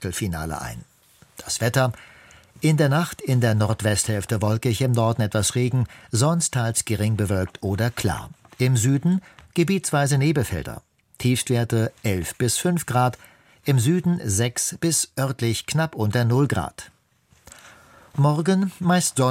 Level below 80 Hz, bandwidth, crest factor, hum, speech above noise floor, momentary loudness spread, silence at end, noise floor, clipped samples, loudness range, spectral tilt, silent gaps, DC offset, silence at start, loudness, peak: -48 dBFS; 16.5 kHz; 16 dB; none; 39 dB; 9 LU; 0 s; -60 dBFS; under 0.1%; 2 LU; -5 dB/octave; none; under 0.1%; 0 s; -22 LUFS; -6 dBFS